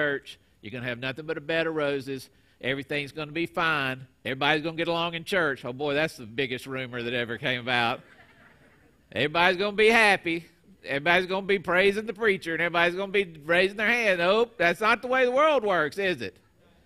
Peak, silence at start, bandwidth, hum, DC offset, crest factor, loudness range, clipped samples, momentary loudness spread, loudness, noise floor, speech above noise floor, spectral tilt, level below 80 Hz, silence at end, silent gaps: -4 dBFS; 0 s; 15 kHz; none; under 0.1%; 22 dB; 6 LU; under 0.1%; 12 LU; -25 LUFS; -59 dBFS; 33 dB; -4.5 dB/octave; -60 dBFS; 0.55 s; none